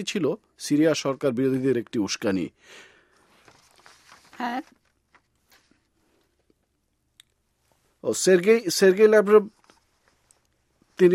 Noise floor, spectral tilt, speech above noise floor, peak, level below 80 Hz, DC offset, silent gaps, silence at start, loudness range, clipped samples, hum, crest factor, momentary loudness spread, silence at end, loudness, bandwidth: -73 dBFS; -4.5 dB/octave; 51 dB; -6 dBFS; -70 dBFS; under 0.1%; none; 0 s; 18 LU; under 0.1%; none; 20 dB; 16 LU; 0 s; -22 LUFS; 16 kHz